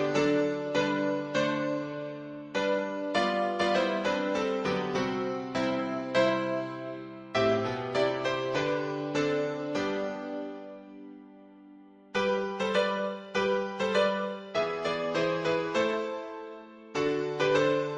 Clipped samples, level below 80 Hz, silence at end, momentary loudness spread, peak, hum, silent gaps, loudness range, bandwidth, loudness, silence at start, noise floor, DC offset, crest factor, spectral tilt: under 0.1%; -66 dBFS; 0 s; 12 LU; -14 dBFS; none; none; 4 LU; 9.8 kHz; -30 LUFS; 0 s; -53 dBFS; under 0.1%; 16 dB; -5 dB/octave